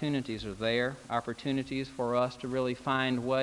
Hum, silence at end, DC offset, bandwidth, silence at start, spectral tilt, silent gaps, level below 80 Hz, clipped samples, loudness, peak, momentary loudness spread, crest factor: none; 0 s; under 0.1%; 11.5 kHz; 0 s; -6 dB/octave; none; -58 dBFS; under 0.1%; -32 LUFS; -14 dBFS; 5 LU; 18 dB